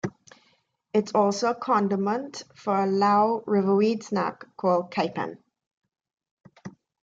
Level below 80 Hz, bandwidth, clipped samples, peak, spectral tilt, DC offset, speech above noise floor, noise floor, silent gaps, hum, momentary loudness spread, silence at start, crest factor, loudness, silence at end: -72 dBFS; 7.8 kHz; under 0.1%; -10 dBFS; -6 dB/octave; under 0.1%; 43 dB; -68 dBFS; 5.67-5.81 s, 6.31-6.37 s; none; 15 LU; 0.05 s; 16 dB; -25 LUFS; 0.35 s